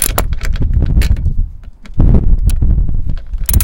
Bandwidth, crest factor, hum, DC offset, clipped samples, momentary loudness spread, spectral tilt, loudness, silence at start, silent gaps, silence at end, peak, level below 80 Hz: 17.5 kHz; 12 dB; none; 2%; 0.4%; 11 LU; -5 dB/octave; -16 LUFS; 0 s; none; 0 s; 0 dBFS; -12 dBFS